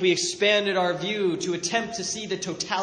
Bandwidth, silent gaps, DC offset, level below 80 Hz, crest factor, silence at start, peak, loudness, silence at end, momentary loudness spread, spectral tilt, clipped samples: 10 kHz; none; under 0.1%; -66 dBFS; 16 dB; 0 s; -8 dBFS; -25 LUFS; 0 s; 8 LU; -3 dB/octave; under 0.1%